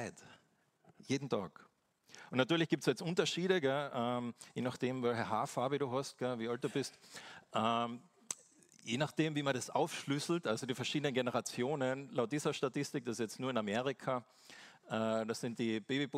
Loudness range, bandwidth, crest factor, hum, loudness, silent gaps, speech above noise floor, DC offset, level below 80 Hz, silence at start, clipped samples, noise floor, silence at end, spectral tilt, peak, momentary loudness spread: 3 LU; 16 kHz; 24 dB; none; -37 LUFS; none; 36 dB; under 0.1%; -82 dBFS; 0 s; under 0.1%; -73 dBFS; 0 s; -5 dB/octave; -14 dBFS; 12 LU